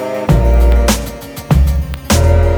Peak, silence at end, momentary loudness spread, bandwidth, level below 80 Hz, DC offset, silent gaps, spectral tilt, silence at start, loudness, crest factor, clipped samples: 0 dBFS; 0 s; 9 LU; over 20 kHz; -14 dBFS; under 0.1%; none; -5.5 dB/octave; 0 s; -13 LUFS; 12 dB; under 0.1%